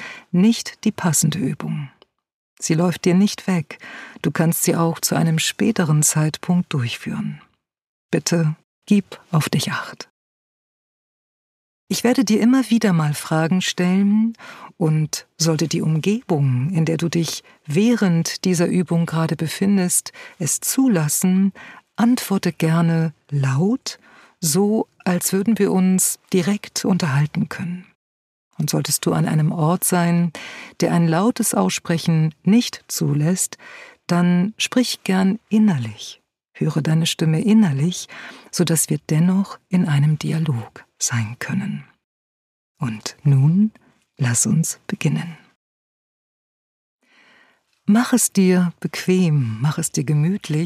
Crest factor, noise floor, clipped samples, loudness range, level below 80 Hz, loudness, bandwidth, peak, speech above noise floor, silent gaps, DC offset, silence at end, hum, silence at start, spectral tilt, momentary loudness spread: 16 dB; -58 dBFS; under 0.1%; 4 LU; -64 dBFS; -19 LUFS; 15.5 kHz; -4 dBFS; 39 dB; 2.33-2.57 s, 7.87-8.09 s, 8.64-8.82 s, 10.10-11.87 s, 27.95-28.51 s, 42.04-42.75 s, 45.56-46.99 s; under 0.1%; 0 s; none; 0 s; -5 dB/octave; 11 LU